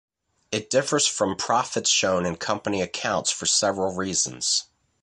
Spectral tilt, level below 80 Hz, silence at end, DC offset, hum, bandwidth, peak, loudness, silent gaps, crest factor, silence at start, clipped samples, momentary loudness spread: -2 dB/octave; -56 dBFS; 0.4 s; under 0.1%; none; 11.5 kHz; -8 dBFS; -23 LUFS; none; 18 dB; 0.5 s; under 0.1%; 6 LU